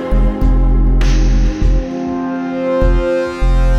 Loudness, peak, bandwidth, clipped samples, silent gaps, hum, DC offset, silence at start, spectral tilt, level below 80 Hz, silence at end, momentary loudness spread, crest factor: -16 LUFS; 0 dBFS; 6.8 kHz; under 0.1%; none; none; under 0.1%; 0 s; -7.5 dB/octave; -14 dBFS; 0 s; 5 LU; 12 dB